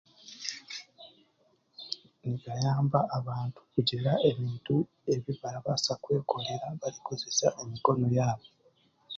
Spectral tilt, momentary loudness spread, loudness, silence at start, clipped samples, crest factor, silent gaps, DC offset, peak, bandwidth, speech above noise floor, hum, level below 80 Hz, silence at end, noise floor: -5.5 dB/octave; 13 LU; -31 LUFS; 0.25 s; under 0.1%; 24 dB; none; under 0.1%; -8 dBFS; 7.6 kHz; 40 dB; none; -66 dBFS; 0 s; -70 dBFS